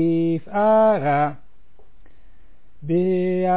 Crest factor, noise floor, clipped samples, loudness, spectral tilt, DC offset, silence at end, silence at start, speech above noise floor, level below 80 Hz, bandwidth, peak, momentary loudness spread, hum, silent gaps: 12 dB; -55 dBFS; under 0.1%; -20 LUFS; -12 dB/octave; 2%; 0 s; 0 s; 36 dB; -56 dBFS; 4 kHz; -10 dBFS; 8 LU; none; none